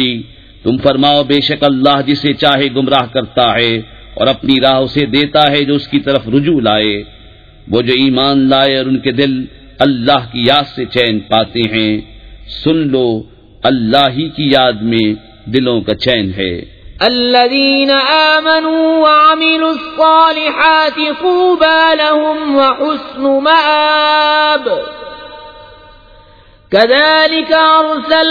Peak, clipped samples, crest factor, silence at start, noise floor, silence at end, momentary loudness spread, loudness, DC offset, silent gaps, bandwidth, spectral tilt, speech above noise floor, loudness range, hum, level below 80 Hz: 0 dBFS; under 0.1%; 12 dB; 0 s; -42 dBFS; 0 s; 9 LU; -11 LUFS; under 0.1%; none; 5.4 kHz; -7 dB/octave; 31 dB; 4 LU; none; -42 dBFS